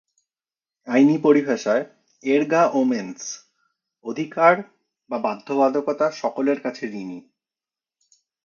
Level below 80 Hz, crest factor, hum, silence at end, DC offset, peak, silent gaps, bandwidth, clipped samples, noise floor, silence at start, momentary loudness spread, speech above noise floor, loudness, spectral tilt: -76 dBFS; 22 dB; none; 1.25 s; under 0.1%; 0 dBFS; none; 7.2 kHz; under 0.1%; under -90 dBFS; 0.85 s; 16 LU; over 70 dB; -21 LUFS; -5.5 dB/octave